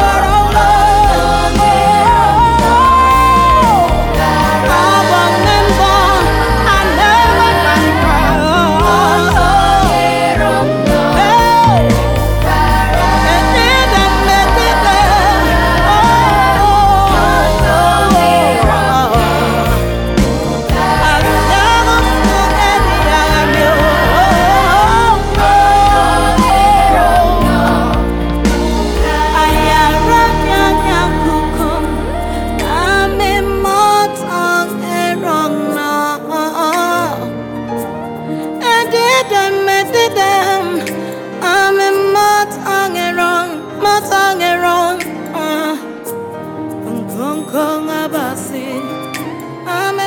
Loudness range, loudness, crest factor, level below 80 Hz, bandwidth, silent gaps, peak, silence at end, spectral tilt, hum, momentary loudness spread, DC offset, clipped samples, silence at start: 6 LU; -11 LUFS; 10 dB; -20 dBFS; 19 kHz; none; 0 dBFS; 0 s; -4.5 dB/octave; none; 10 LU; under 0.1%; under 0.1%; 0 s